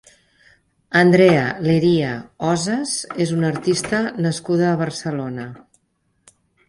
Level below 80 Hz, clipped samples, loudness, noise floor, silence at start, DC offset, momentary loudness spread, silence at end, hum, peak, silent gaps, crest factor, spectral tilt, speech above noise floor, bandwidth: -56 dBFS; under 0.1%; -19 LUFS; -67 dBFS; 0.9 s; under 0.1%; 12 LU; 1.1 s; none; -2 dBFS; none; 18 dB; -5.5 dB/octave; 49 dB; 11.5 kHz